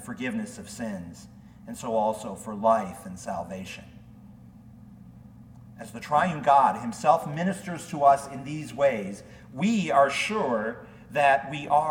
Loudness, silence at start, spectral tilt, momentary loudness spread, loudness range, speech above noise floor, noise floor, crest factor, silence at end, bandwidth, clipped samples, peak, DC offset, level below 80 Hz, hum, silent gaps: -26 LUFS; 0 s; -5 dB/octave; 18 LU; 8 LU; 23 dB; -49 dBFS; 20 dB; 0 s; 16.5 kHz; under 0.1%; -6 dBFS; under 0.1%; -60 dBFS; none; none